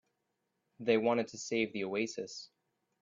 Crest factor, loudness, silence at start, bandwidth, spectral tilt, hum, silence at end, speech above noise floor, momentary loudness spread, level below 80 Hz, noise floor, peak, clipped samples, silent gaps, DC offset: 20 dB; -34 LUFS; 0.8 s; 7.6 kHz; -4 dB/octave; none; 0.55 s; 49 dB; 13 LU; -78 dBFS; -83 dBFS; -16 dBFS; under 0.1%; none; under 0.1%